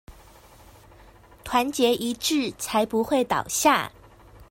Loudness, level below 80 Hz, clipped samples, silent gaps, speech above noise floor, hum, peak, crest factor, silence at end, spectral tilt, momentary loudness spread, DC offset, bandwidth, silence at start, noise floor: -23 LUFS; -54 dBFS; under 0.1%; none; 27 dB; none; -6 dBFS; 20 dB; 0.1 s; -2.5 dB/octave; 5 LU; under 0.1%; 16.5 kHz; 0.1 s; -51 dBFS